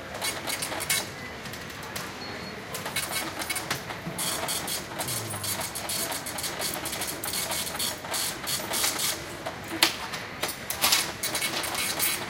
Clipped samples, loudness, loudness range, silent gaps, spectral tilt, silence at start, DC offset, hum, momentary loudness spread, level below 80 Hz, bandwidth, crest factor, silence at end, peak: under 0.1%; -28 LUFS; 5 LU; none; -1 dB/octave; 0 s; under 0.1%; none; 11 LU; -56 dBFS; 17 kHz; 28 dB; 0 s; -4 dBFS